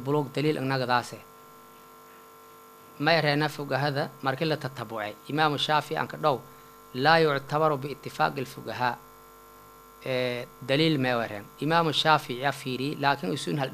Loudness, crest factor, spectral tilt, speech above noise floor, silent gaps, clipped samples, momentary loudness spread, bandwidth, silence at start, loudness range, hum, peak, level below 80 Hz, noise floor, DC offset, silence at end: -27 LUFS; 24 dB; -5.5 dB/octave; 24 dB; none; under 0.1%; 12 LU; 15.5 kHz; 0 s; 4 LU; none; -4 dBFS; -66 dBFS; -51 dBFS; under 0.1%; 0 s